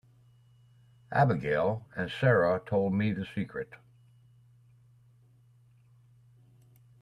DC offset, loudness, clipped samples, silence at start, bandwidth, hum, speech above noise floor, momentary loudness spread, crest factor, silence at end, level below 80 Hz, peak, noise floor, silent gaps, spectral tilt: under 0.1%; -29 LUFS; under 0.1%; 1.1 s; 10.5 kHz; none; 33 dB; 11 LU; 22 dB; 3.25 s; -64 dBFS; -12 dBFS; -61 dBFS; none; -8.5 dB/octave